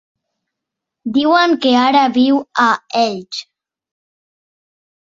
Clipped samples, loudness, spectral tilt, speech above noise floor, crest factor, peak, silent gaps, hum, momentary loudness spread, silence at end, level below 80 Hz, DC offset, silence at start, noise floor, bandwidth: under 0.1%; -14 LUFS; -4 dB/octave; 67 dB; 16 dB; 0 dBFS; none; none; 14 LU; 1.6 s; -62 dBFS; under 0.1%; 1.05 s; -81 dBFS; 7.6 kHz